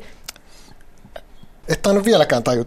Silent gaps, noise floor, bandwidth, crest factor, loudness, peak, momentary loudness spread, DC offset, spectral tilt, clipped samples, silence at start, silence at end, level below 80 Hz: none; -43 dBFS; 16 kHz; 18 dB; -17 LUFS; -2 dBFS; 22 LU; under 0.1%; -5 dB/octave; under 0.1%; 0 s; 0 s; -42 dBFS